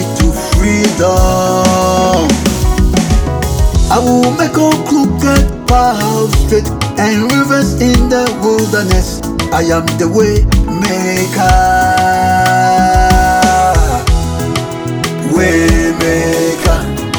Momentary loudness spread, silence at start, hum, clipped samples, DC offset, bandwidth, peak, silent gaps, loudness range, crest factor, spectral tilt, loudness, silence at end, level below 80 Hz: 5 LU; 0 s; none; under 0.1%; under 0.1%; over 20 kHz; 0 dBFS; none; 2 LU; 10 dB; -5 dB/octave; -11 LUFS; 0 s; -16 dBFS